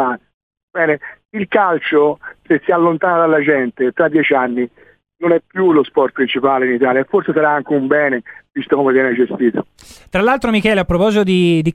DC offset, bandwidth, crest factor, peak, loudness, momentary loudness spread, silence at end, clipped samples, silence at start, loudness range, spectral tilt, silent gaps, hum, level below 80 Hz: under 0.1%; 12 kHz; 14 dB; 0 dBFS; -15 LUFS; 9 LU; 0 s; under 0.1%; 0 s; 1 LU; -7 dB/octave; 0.34-0.51 s, 0.63-0.68 s; none; -44 dBFS